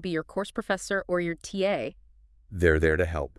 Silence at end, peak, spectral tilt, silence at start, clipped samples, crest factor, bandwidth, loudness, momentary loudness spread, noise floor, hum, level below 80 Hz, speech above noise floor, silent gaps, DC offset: 0.1 s; -6 dBFS; -5.5 dB/octave; 0 s; under 0.1%; 22 dB; 12 kHz; -27 LUFS; 10 LU; -56 dBFS; none; -44 dBFS; 29 dB; none; under 0.1%